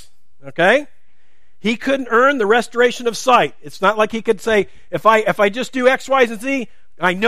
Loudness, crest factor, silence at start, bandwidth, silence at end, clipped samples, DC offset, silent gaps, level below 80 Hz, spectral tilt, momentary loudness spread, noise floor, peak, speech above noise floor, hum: -16 LUFS; 16 dB; 0.45 s; 15 kHz; 0 s; under 0.1%; 2%; none; -54 dBFS; -4 dB/octave; 8 LU; -63 dBFS; 0 dBFS; 46 dB; none